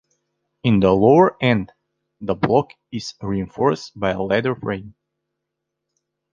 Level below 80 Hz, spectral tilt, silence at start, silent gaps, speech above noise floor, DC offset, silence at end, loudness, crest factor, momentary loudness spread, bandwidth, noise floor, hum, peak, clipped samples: -48 dBFS; -7 dB/octave; 0.65 s; none; 61 dB; under 0.1%; 1.45 s; -19 LUFS; 20 dB; 17 LU; 7.4 kHz; -80 dBFS; none; -2 dBFS; under 0.1%